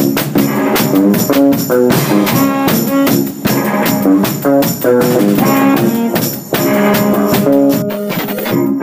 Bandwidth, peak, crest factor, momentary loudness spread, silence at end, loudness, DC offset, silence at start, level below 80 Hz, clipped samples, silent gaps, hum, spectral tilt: 16 kHz; 0 dBFS; 10 dB; 5 LU; 0 s; -12 LUFS; under 0.1%; 0 s; -48 dBFS; under 0.1%; none; none; -5.5 dB/octave